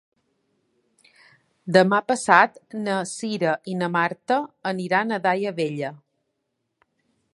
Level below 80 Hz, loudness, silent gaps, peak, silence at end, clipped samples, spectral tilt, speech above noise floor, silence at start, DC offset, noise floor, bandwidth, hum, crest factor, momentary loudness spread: -74 dBFS; -22 LUFS; none; 0 dBFS; 1.4 s; under 0.1%; -5 dB/octave; 55 dB; 1.65 s; under 0.1%; -77 dBFS; 11.5 kHz; none; 24 dB; 12 LU